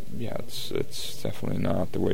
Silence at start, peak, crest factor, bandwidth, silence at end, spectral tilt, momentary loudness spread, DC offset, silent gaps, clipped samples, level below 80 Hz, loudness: 0 s; -10 dBFS; 18 dB; 16.5 kHz; 0 s; -5.5 dB/octave; 7 LU; 5%; none; under 0.1%; -50 dBFS; -31 LUFS